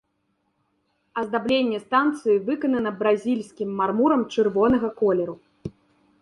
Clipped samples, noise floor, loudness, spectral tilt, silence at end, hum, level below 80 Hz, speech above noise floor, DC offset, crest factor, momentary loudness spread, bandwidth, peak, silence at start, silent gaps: under 0.1%; -72 dBFS; -23 LUFS; -6.5 dB/octave; 0.5 s; none; -56 dBFS; 50 dB; under 0.1%; 16 dB; 12 LU; 11 kHz; -8 dBFS; 1.15 s; none